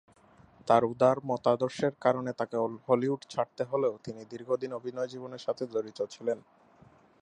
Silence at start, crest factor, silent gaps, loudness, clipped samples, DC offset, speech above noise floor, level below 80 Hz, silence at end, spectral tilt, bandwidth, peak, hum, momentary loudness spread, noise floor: 0.65 s; 22 dB; none; -30 LUFS; under 0.1%; under 0.1%; 29 dB; -72 dBFS; 0.8 s; -6.5 dB/octave; 10 kHz; -8 dBFS; none; 11 LU; -59 dBFS